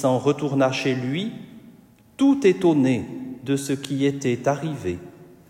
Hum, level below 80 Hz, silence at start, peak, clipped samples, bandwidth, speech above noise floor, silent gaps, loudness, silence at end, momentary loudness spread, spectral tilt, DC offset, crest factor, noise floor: none; -60 dBFS; 0 s; -6 dBFS; under 0.1%; 14.5 kHz; 30 dB; none; -22 LUFS; 0.25 s; 14 LU; -6 dB/octave; under 0.1%; 16 dB; -51 dBFS